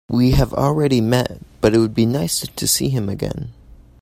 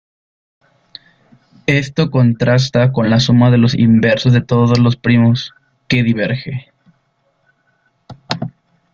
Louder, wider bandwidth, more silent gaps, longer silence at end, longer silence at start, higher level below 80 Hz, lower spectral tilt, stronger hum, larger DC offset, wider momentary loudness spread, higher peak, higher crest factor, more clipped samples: second, -18 LUFS vs -13 LUFS; first, 16 kHz vs 7.2 kHz; neither; second, 0.25 s vs 0.45 s; second, 0.1 s vs 1.7 s; first, -32 dBFS vs -46 dBFS; second, -5 dB/octave vs -7 dB/octave; neither; neither; second, 10 LU vs 13 LU; about the same, 0 dBFS vs 0 dBFS; about the same, 18 dB vs 14 dB; neither